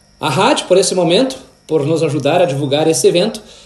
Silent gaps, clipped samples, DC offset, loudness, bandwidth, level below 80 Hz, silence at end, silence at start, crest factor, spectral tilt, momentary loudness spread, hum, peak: none; under 0.1%; under 0.1%; -14 LUFS; 12.5 kHz; -54 dBFS; 0.25 s; 0.2 s; 14 dB; -4.5 dB/octave; 8 LU; none; 0 dBFS